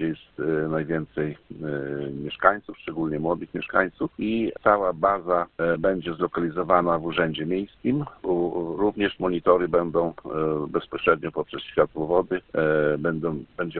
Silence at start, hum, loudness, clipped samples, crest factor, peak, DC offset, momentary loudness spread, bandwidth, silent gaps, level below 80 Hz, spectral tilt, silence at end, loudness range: 0 s; none; -25 LUFS; under 0.1%; 24 dB; -2 dBFS; under 0.1%; 9 LU; 4.4 kHz; none; -52 dBFS; -11 dB/octave; 0 s; 3 LU